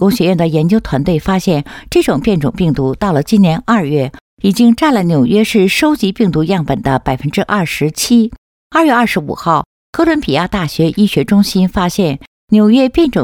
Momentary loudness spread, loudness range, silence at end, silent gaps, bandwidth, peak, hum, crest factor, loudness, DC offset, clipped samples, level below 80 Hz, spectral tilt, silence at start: 6 LU; 2 LU; 0 s; 4.21-4.37 s, 8.38-8.70 s, 9.66-9.93 s, 12.27-12.48 s; 17 kHz; 0 dBFS; none; 12 dB; -13 LUFS; under 0.1%; under 0.1%; -36 dBFS; -6 dB/octave; 0 s